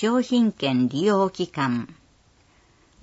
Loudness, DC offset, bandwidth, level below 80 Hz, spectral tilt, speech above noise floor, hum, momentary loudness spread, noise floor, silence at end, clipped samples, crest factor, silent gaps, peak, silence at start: -23 LUFS; under 0.1%; 8 kHz; -62 dBFS; -6 dB/octave; 37 dB; none; 6 LU; -59 dBFS; 1.1 s; under 0.1%; 14 dB; none; -10 dBFS; 0 s